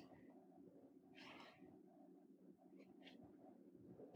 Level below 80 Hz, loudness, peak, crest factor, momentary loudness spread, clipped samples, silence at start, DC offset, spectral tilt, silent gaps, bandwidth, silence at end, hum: under -90 dBFS; -65 LUFS; -44 dBFS; 20 dB; 6 LU; under 0.1%; 0 s; under 0.1%; -6 dB/octave; none; 9.4 kHz; 0 s; none